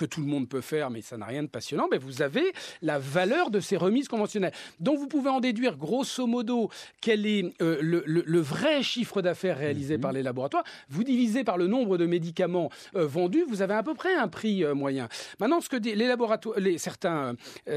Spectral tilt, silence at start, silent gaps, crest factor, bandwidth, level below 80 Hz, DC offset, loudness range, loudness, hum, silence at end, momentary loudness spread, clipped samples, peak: -5.5 dB/octave; 0 s; none; 16 dB; 14 kHz; -76 dBFS; under 0.1%; 1 LU; -28 LUFS; none; 0 s; 7 LU; under 0.1%; -10 dBFS